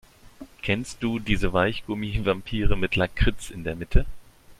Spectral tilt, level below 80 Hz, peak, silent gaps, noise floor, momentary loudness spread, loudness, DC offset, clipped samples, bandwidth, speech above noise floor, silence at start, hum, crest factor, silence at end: -6 dB/octave; -30 dBFS; -4 dBFS; none; -46 dBFS; 10 LU; -26 LUFS; under 0.1%; under 0.1%; 13 kHz; 23 dB; 0.4 s; none; 20 dB; 0.05 s